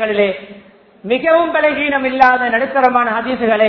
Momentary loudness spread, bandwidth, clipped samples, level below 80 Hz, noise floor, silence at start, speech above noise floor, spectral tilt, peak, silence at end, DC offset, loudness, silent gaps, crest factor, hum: 7 LU; 5.4 kHz; 0.2%; -52 dBFS; -42 dBFS; 0 s; 28 dB; -6.5 dB/octave; 0 dBFS; 0 s; under 0.1%; -14 LUFS; none; 14 dB; none